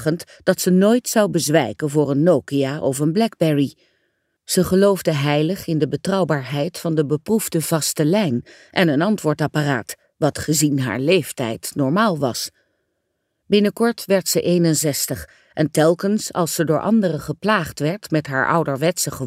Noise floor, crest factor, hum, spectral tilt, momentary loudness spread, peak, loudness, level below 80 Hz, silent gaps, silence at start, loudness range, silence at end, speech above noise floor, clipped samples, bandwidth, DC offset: -73 dBFS; 18 dB; none; -5 dB/octave; 7 LU; -2 dBFS; -19 LUFS; -54 dBFS; none; 0 s; 2 LU; 0 s; 55 dB; under 0.1%; 16 kHz; under 0.1%